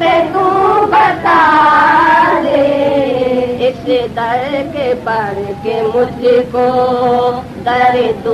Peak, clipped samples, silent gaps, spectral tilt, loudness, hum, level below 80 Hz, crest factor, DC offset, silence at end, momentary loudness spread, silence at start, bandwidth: -2 dBFS; under 0.1%; none; -6 dB/octave; -12 LUFS; none; -42 dBFS; 10 dB; under 0.1%; 0 s; 9 LU; 0 s; 13 kHz